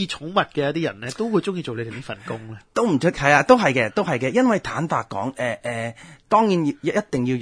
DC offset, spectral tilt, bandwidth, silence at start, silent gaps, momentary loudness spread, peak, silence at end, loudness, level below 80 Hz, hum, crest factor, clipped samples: under 0.1%; -5.5 dB/octave; 10.5 kHz; 0 s; none; 14 LU; 0 dBFS; 0 s; -21 LUFS; -54 dBFS; none; 20 dB; under 0.1%